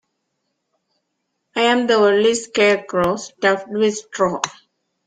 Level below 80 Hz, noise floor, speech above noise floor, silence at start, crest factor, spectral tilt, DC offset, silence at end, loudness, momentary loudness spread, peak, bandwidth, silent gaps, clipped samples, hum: -58 dBFS; -74 dBFS; 57 dB; 1.55 s; 18 dB; -3.5 dB/octave; under 0.1%; 0.55 s; -18 LUFS; 7 LU; -2 dBFS; 9.6 kHz; none; under 0.1%; none